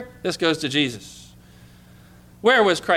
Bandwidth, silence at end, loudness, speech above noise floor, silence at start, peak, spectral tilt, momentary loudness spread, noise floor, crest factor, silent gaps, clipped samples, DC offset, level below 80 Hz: 15.5 kHz; 0 s; -20 LUFS; 28 dB; 0 s; -6 dBFS; -4 dB/octave; 16 LU; -48 dBFS; 16 dB; none; under 0.1%; under 0.1%; -56 dBFS